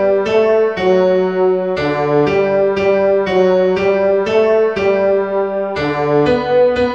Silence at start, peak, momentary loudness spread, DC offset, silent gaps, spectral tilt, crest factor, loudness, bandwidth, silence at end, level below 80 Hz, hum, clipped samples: 0 s; -2 dBFS; 4 LU; 0.3%; none; -7 dB/octave; 12 dB; -14 LUFS; 7.4 kHz; 0 s; -44 dBFS; none; under 0.1%